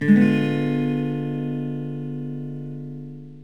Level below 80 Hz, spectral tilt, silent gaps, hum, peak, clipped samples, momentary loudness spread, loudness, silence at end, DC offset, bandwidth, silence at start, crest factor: -74 dBFS; -9 dB/octave; none; none; -4 dBFS; under 0.1%; 17 LU; -24 LUFS; 0 s; 0.5%; 6.6 kHz; 0 s; 18 dB